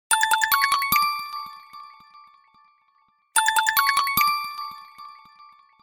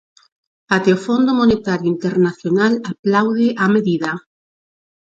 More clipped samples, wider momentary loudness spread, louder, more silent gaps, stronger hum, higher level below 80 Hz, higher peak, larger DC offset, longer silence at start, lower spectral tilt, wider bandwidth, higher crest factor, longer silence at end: neither; first, 23 LU vs 5 LU; second, -21 LUFS vs -17 LUFS; second, none vs 2.99-3.03 s; neither; second, -60 dBFS vs -50 dBFS; second, -6 dBFS vs 0 dBFS; neither; second, 0.1 s vs 0.7 s; second, 1.5 dB/octave vs -7 dB/octave; first, 17 kHz vs 7.8 kHz; about the same, 20 dB vs 18 dB; second, 0.7 s vs 0.95 s